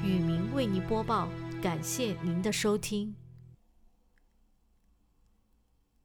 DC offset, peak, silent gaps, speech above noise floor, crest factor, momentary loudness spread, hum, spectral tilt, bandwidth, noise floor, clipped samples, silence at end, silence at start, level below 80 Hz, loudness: under 0.1%; -18 dBFS; none; 38 dB; 16 dB; 7 LU; none; -5.5 dB/octave; 20 kHz; -70 dBFS; under 0.1%; 2.5 s; 0 s; -54 dBFS; -32 LUFS